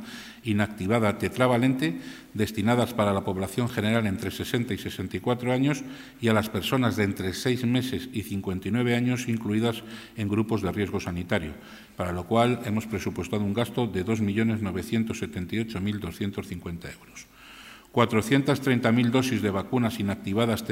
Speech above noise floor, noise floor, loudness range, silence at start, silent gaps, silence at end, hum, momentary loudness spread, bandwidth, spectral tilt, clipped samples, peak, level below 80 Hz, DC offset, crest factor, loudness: 21 dB; -48 dBFS; 3 LU; 0 s; none; 0 s; none; 13 LU; 16 kHz; -6 dB/octave; under 0.1%; -6 dBFS; -58 dBFS; under 0.1%; 22 dB; -27 LUFS